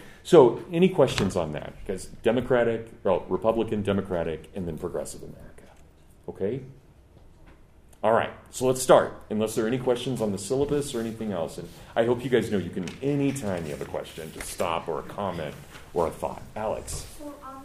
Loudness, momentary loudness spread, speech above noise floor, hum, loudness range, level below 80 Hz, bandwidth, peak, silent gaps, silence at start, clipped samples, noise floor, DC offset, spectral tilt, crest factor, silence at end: -26 LUFS; 15 LU; 27 dB; none; 7 LU; -50 dBFS; 15.5 kHz; -2 dBFS; none; 0 s; under 0.1%; -52 dBFS; under 0.1%; -5.5 dB/octave; 24 dB; 0 s